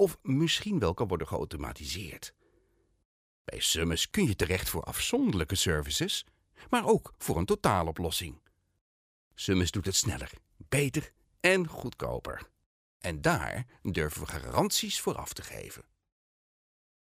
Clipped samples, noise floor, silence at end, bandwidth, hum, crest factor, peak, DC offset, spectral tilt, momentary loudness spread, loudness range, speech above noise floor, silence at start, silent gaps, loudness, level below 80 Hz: under 0.1%; -70 dBFS; 1.25 s; 16 kHz; none; 22 dB; -10 dBFS; under 0.1%; -4 dB/octave; 14 LU; 4 LU; 39 dB; 0 s; 3.05-3.45 s, 8.81-9.31 s, 12.66-13.00 s; -30 LUFS; -50 dBFS